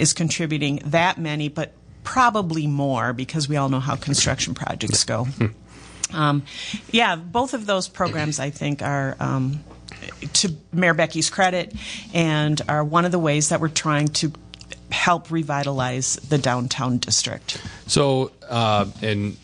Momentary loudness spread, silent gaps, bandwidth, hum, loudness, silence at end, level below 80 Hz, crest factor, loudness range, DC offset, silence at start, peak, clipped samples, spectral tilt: 9 LU; none; 10.5 kHz; none; -22 LUFS; 0.05 s; -50 dBFS; 18 dB; 2 LU; under 0.1%; 0 s; -4 dBFS; under 0.1%; -4 dB/octave